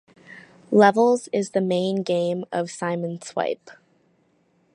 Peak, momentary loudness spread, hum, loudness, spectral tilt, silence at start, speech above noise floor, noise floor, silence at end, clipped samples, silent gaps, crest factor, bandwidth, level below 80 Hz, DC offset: -2 dBFS; 12 LU; none; -22 LUFS; -5.5 dB/octave; 0.3 s; 42 dB; -64 dBFS; 1 s; under 0.1%; none; 22 dB; 11 kHz; -74 dBFS; under 0.1%